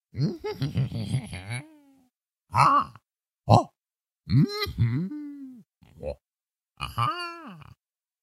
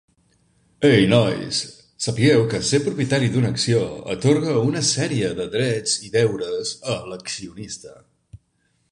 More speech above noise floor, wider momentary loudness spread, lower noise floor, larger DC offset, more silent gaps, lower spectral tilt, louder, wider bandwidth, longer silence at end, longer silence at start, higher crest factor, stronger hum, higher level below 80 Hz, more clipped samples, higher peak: first, over 66 dB vs 47 dB; first, 19 LU vs 13 LU; first, under -90 dBFS vs -67 dBFS; neither; neither; first, -7 dB/octave vs -5 dB/octave; second, -26 LUFS vs -20 LUFS; first, 14.5 kHz vs 11 kHz; about the same, 0.6 s vs 0.55 s; second, 0.15 s vs 0.8 s; first, 26 dB vs 20 dB; neither; about the same, -50 dBFS vs -52 dBFS; neither; about the same, -2 dBFS vs -2 dBFS